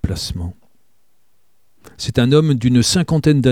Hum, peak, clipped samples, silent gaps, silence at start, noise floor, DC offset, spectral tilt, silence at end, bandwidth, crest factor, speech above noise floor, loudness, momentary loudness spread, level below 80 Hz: none; 0 dBFS; under 0.1%; none; 0.05 s; -66 dBFS; 0.4%; -5.5 dB/octave; 0 s; 16 kHz; 16 dB; 51 dB; -16 LUFS; 13 LU; -36 dBFS